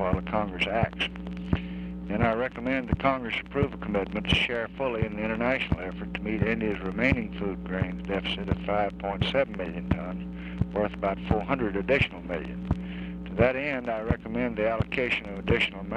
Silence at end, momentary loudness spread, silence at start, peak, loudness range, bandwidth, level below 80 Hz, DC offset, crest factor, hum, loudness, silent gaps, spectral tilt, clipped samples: 0 s; 8 LU; 0 s; -8 dBFS; 2 LU; 9.6 kHz; -42 dBFS; under 0.1%; 20 dB; none; -28 LUFS; none; -7 dB/octave; under 0.1%